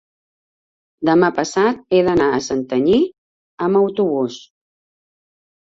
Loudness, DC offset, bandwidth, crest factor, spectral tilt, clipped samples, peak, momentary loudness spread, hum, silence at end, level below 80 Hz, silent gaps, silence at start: -17 LUFS; under 0.1%; 7.8 kHz; 16 dB; -5.5 dB/octave; under 0.1%; -2 dBFS; 8 LU; none; 1.4 s; -52 dBFS; 3.18-3.58 s; 1 s